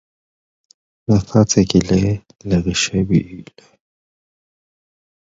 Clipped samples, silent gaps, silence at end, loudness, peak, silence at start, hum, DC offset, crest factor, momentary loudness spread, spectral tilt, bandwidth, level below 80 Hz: under 0.1%; none; 1.9 s; -17 LUFS; 0 dBFS; 1.1 s; none; under 0.1%; 20 dB; 14 LU; -5.5 dB/octave; 8 kHz; -38 dBFS